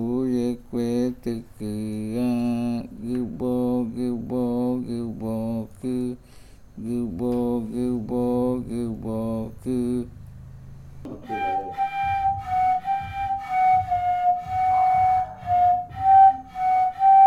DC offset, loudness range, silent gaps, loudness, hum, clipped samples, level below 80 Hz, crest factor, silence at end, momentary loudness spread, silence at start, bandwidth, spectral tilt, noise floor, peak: under 0.1%; 8 LU; none; -24 LUFS; none; under 0.1%; -48 dBFS; 16 dB; 0 s; 12 LU; 0 s; 13.5 kHz; -7.5 dB/octave; -46 dBFS; -6 dBFS